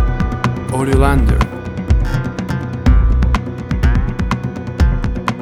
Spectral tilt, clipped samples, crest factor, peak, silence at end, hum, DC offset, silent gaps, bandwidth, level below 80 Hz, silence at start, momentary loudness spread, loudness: -7.5 dB/octave; under 0.1%; 14 dB; 0 dBFS; 0 s; none; under 0.1%; none; 12 kHz; -16 dBFS; 0 s; 8 LU; -17 LUFS